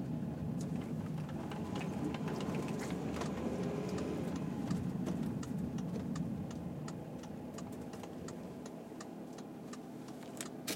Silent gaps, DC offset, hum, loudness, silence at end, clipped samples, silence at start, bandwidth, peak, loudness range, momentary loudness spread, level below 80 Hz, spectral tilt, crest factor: none; under 0.1%; none; -41 LUFS; 0 s; under 0.1%; 0 s; 16.5 kHz; -24 dBFS; 8 LU; 9 LU; -60 dBFS; -6.5 dB/octave; 16 dB